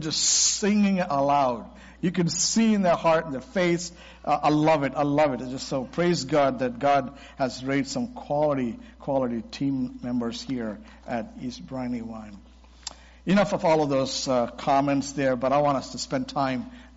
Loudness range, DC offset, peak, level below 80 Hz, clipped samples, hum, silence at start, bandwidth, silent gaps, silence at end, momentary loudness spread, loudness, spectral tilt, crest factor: 7 LU; under 0.1%; -10 dBFS; -52 dBFS; under 0.1%; none; 0 s; 8 kHz; none; 0.1 s; 14 LU; -25 LUFS; -4.5 dB/octave; 16 dB